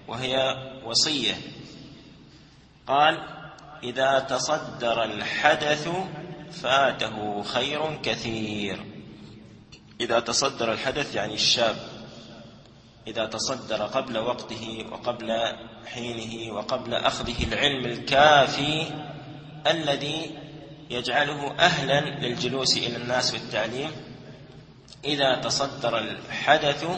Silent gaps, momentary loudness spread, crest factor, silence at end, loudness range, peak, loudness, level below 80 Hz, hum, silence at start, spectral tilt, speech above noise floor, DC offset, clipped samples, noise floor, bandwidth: none; 19 LU; 24 dB; 0 s; 6 LU; -2 dBFS; -25 LUFS; -52 dBFS; none; 0 s; -3 dB/octave; 27 dB; under 0.1%; under 0.1%; -52 dBFS; 8.8 kHz